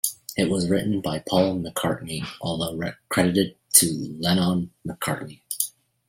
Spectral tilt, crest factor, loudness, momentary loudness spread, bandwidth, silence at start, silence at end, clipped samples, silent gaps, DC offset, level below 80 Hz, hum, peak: -4 dB/octave; 24 dB; -24 LUFS; 13 LU; 16.5 kHz; 0.05 s; 0.4 s; under 0.1%; none; under 0.1%; -56 dBFS; none; 0 dBFS